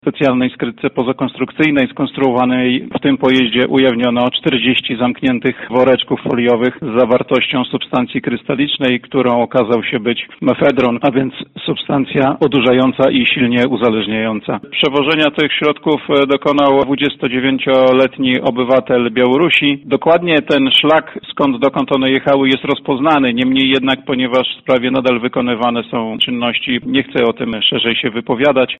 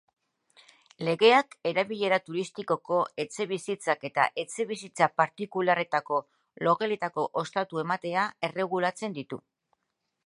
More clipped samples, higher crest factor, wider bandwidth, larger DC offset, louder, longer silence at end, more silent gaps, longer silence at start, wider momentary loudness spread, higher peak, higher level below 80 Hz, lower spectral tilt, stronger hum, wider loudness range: neither; second, 12 dB vs 22 dB; second, 6.4 kHz vs 11.5 kHz; neither; first, -14 LUFS vs -28 LUFS; second, 0.05 s vs 0.9 s; neither; second, 0.05 s vs 1 s; second, 6 LU vs 9 LU; first, -2 dBFS vs -6 dBFS; first, -50 dBFS vs -80 dBFS; first, -7 dB/octave vs -4.5 dB/octave; neither; about the same, 3 LU vs 3 LU